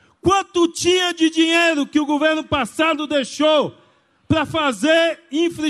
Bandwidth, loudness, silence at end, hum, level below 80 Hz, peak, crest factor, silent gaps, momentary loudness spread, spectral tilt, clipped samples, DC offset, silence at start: 12.5 kHz; -18 LUFS; 0 s; none; -50 dBFS; -6 dBFS; 14 dB; none; 6 LU; -3.5 dB/octave; under 0.1%; under 0.1%; 0.25 s